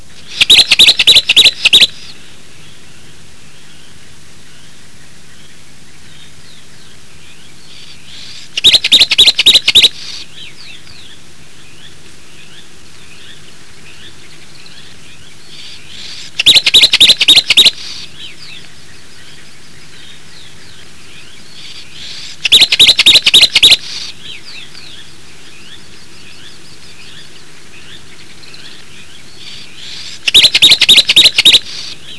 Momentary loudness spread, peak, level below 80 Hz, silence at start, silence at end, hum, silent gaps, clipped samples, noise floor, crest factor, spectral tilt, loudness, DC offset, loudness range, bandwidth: 26 LU; 0 dBFS; -44 dBFS; 0.3 s; 0.05 s; none; none; 1%; -40 dBFS; 14 dB; 0.5 dB/octave; -4 LUFS; 5%; 11 LU; 11 kHz